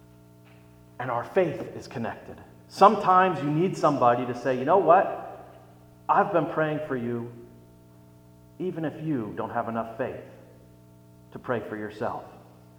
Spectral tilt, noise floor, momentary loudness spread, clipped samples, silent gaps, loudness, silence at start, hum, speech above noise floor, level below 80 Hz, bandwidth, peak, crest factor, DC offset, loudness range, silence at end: -7 dB/octave; -52 dBFS; 20 LU; under 0.1%; none; -25 LUFS; 1 s; 60 Hz at -55 dBFS; 27 dB; -64 dBFS; 20 kHz; -4 dBFS; 24 dB; under 0.1%; 11 LU; 0.35 s